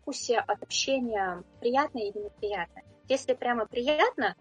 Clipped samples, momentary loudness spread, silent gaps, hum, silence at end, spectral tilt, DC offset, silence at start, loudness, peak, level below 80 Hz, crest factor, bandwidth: under 0.1%; 10 LU; none; none; 0.1 s; -2.5 dB/octave; under 0.1%; 0.05 s; -29 LUFS; -12 dBFS; -62 dBFS; 18 dB; 9.6 kHz